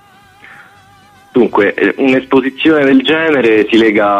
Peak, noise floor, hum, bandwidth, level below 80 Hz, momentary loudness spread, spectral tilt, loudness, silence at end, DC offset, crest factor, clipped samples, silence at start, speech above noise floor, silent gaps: 0 dBFS; -43 dBFS; none; 8.8 kHz; -52 dBFS; 4 LU; -6 dB/octave; -10 LUFS; 0 s; under 0.1%; 12 dB; under 0.1%; 1.35 s; 33 dB; none